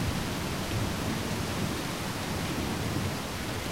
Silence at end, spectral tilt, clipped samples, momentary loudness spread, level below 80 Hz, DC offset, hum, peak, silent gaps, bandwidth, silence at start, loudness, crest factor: 0 s; -4.5 dB/octave; under 0.1%; 2 LU; -44 dBFS; 0.3%; none; -18 dBFS; none; 16 kHz; 0 s; -32 LUFS; 14 dB